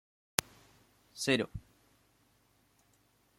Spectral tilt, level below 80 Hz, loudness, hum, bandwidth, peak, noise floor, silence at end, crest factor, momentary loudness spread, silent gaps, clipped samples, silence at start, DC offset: -3 dB/octave; -64 dBFS; -34 LUFS; none; 16.5 kHz; 0 dBFS; -71 dBFS; 1.8 s; 40 dB; 19 LU; none; under 0.1%; 1.15 s; under 0.1%